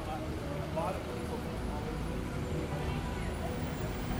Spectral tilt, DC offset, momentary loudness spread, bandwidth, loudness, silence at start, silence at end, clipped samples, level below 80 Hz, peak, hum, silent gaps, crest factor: -6.5 dB/octave; under 0.1%; 3 LU; over 20 kHz; -37 LUFS; 0 s; 0 s; under 0.1%; -44 dBFS; -22 dBFS; none; none; 14 dB